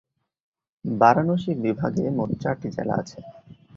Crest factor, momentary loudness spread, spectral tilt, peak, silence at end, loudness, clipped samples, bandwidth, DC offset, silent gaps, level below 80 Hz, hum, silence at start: 22 dB; 15 LU; -8 dB/octave; -2 dBFS; 0.25 s; -23 LUFS; under 0.1%; 7.6 kHz; under 0.1%; none; -56 dBFS; none; 0.85 s